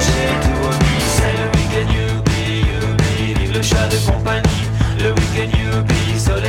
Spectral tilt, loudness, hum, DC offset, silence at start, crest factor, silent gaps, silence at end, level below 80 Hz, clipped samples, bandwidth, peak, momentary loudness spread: -5 dB/octave; -16 LUFS; none; under 0.1%; 0 s; 14 dB; none; 0 s; -22 dBFS; under 0.1%; 16 kHz; -2 dBFS; 2 LU